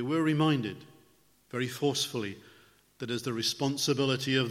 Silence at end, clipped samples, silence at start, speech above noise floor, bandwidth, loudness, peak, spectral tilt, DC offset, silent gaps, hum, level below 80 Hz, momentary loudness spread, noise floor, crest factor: 0 s; under 0.1%; 0 s; 35 dB; 16 kHz; -30 LUFS; -12 dBFS; -4.5 dB/octave; under 0.1%; none; none; -72 dBFS; 13 LU; -65 dBFS; 18 dB